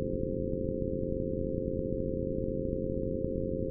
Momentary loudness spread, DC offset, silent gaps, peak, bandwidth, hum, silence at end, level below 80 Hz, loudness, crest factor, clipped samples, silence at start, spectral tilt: 0 LU; under 0.1%; none; -16 dBFS; 0.6 kHz; none; 0 s; -42 dBFS; -34 LUFS; 16 dB; under 0.1%; 0 s; -18 dB/octave